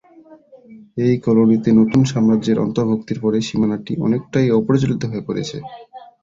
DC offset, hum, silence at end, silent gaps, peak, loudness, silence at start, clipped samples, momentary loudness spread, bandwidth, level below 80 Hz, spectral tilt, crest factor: under 0.1%; none; 0.15 s; none; -2 dBFS; -17 LUFS; 0.3 s; under 0.1%; 11 LU; 7.6 kHz; -52 dBFS; -7.5 dB/octave; 14 dB